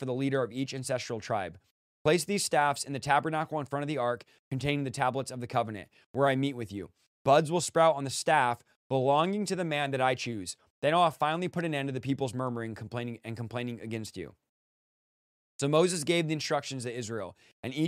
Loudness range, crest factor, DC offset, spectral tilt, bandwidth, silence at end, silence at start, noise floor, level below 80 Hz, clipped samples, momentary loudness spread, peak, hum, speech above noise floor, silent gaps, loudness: 7 LU; 20 dB; under 0.1%; -4.5 dB/octave; 15.5 kHz; 0 s; 0 s; under -90 dBFS; -68 dBFS; under 0.1%; 13 LU; -10 dBFS; none; over 60 dB; 1.71-2.05 s, 4.39-4.51 s, 6.06-6.14 s, 7.07-7.25 s, 8.76-8.90 s, 10.70-10.82 s, 14.49-15.59 s, 17.53-17.63 s; -30 LUFS